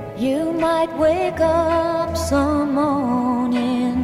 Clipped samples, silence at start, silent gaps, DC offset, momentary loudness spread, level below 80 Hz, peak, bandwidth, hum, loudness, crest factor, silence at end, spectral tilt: under 0.1%; 0 s; none; under 0.1%; 3 LU; -40 dBFS; -6 dBFS; 15 kHz; none; -19 LUFS; 12 dB; 0 s; -6 dB/octave